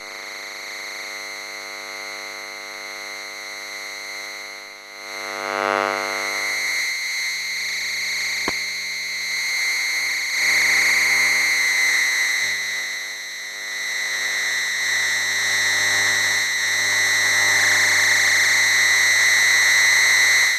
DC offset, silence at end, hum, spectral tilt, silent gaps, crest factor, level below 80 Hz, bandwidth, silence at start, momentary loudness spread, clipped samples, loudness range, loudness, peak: under 0.1%; 0 s; 50 Hz at -55 dBFS; 1.5 dB/octave; none; 16 dB; -64 dBFS; 14 kHz; 0 s; 17 LU; under 0.1%; 15 LU; -17 LUFS; -6 dBFS